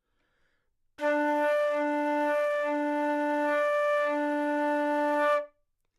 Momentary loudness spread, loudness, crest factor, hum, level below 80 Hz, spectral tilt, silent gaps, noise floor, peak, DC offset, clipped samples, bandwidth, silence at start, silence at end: 3 LU; -28 LUFS; 12 dB; none; -78 dBFS; -3 dB/octave; none; -73 dBFS; -16 dBFS; under 0.1%; under 0.1%; 13 kHz; 1 s; 0.5 s